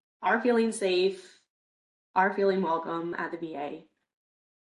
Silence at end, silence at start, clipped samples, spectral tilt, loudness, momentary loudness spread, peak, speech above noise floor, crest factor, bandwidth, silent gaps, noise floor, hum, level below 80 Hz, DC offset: 0.85 s; 0.2 s; under 0.1%; -5 dB/octave; -28 LUFS; 13 LU; -12 dBFS; over 62 dB; 18 dB; 11.5 kHz; 1.50-2.14 s; under -90 dBFS; none; -78 dBFS; under 0.1%